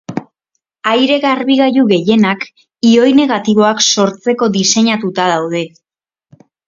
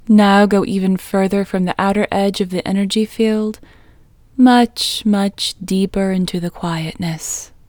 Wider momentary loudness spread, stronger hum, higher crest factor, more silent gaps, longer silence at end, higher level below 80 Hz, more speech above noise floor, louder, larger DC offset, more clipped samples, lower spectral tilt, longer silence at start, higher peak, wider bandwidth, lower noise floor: about the same, 11 LU vs 11 LU; neither; about the same, 12 dB vs 16 dB; neither; first, 1 s vs 0.25 s; second, -58 dBFS vs -44 dBFS; first, 60 dB vs 31 dB; first, -12 LUFS vs -16 LUFS; neither; neither; second, -4 dB/octave vs -5.5 dB/octave; about the same, 0.1 s vs 0.05 s; about the same, 0 dBFS vs 0 dBFS; second, 7.6 kHz vs 19.5 kHz; first, -71 dBFS vs -47 dBFS